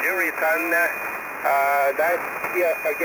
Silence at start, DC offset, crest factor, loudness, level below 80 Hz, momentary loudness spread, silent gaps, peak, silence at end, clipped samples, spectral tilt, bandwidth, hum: 0 s; under 0.1%; 12 dB; -22 LUFS; -64 dBFS; 6 LU; none; -10 dBFS; 0 s; under 0.1%; -3 dB/octave; 17.5 kHz; none